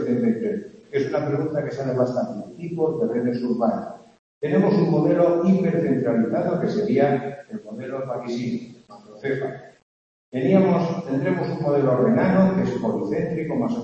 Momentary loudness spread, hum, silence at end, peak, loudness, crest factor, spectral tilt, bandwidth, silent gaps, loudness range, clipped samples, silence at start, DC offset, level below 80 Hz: 14 LU; none; 0 s; -4 dBFS; -22 LUFS; 18 dB; -9 dB/octave; 7.4 kHz; 4.19-4.41 s, 9.83-10.32 s; 5 LU; under 0.1%; 0 s; under 0.1%; -60 dBFS